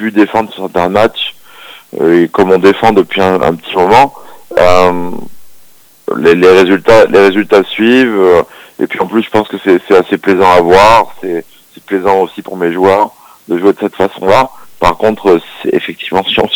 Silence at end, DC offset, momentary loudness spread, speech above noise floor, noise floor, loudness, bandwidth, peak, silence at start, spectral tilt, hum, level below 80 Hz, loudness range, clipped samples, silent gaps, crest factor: 0 s; under 0.1%; 12 LU; 33 dB; -42 dBFS; -9 LUFS; over 20 kHz; 0 dBFS; 0 s; -5.5 dB/octave; none; -38 dBFS; 4 LU; 3%; none; 10 dB